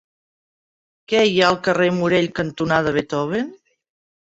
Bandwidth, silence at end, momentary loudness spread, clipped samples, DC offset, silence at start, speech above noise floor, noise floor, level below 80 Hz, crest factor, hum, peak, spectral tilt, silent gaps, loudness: 8 kHz; 0.8 s; 8 LU; under 0.1%; under 0.1%; 1.1 s; over 72 dB; under -90 dBFS; -54 dBFS; 20 dB; none; -2 dBFS; -5.5 dB/octave; none; -19 LUFS